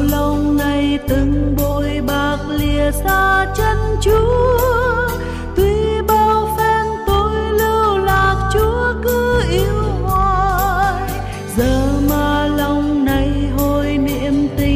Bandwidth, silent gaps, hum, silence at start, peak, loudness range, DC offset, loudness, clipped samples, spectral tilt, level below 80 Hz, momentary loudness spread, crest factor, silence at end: 16 kHz; none; none; 0 s; -4 dBFS; 2 LU; under 0.1%; -16 LUFS; under 0.1%; -6 dB/octave; -24 dBFS; 4 LU; 10 dB; 0 s